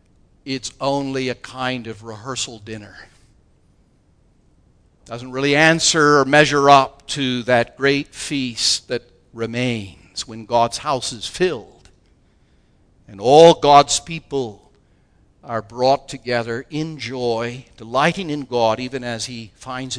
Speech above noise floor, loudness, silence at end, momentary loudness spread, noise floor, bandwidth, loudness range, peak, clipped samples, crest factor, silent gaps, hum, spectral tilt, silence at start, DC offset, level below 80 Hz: 38 dB; -18 LUFS; 0 s; 17 LU; -57 dBFS; 11 kHz; 11 LU; 0 dBFS; under 0.1%; 20 dB; none; none; -3.5 dB/octave; 0.45 s; under 0.1%; -52 dBFS